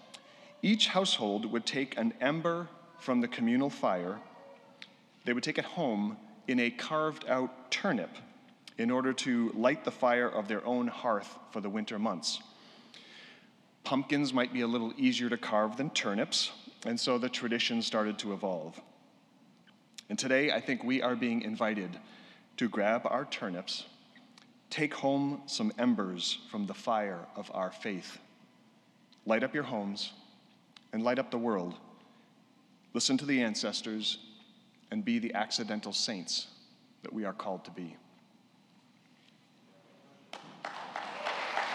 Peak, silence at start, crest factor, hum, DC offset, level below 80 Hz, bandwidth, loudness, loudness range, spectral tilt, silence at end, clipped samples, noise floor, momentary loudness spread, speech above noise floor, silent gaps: -14 dBFS; 0 s; 22 dB; none; under 0.1%; under -90 dBFS; 11.5 kHz; -33 LUFS; 6 LU; -4 dB/octave; 0 s; under 0.1%; -64 dBFS; 16 LU; 31 dB; none